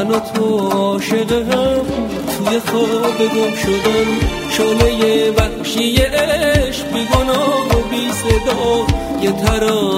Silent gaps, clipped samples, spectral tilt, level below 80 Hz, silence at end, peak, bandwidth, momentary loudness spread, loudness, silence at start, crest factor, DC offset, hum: none; under 0.1%; -5 dB/octave; -28 dBFS; 0 s; 0 dBFS; 16.5 kHz; 4 LU; -15 LUFS; 0 s; 14 dB; under 0.1%; none